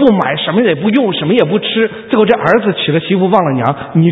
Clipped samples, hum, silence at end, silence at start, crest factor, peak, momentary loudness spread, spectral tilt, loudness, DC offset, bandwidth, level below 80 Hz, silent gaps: 0.2%; none; 0 s; 0 s; 12 dB; 0 dBFS; 4 LU; -8.5 dB/octave; -12 LUFS; under 0.1%; 5.6 kHz; -50 dBFS; none